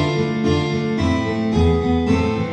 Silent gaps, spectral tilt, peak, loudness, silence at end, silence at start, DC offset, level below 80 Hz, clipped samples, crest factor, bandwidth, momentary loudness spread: none; -7 dB/octave; -6 dBFS; -19 LUFS; 0 s; 0 s; under 0.1%; -32 dBFS; under 0.1%; 12 dB; 9.2 kHz; 3 LU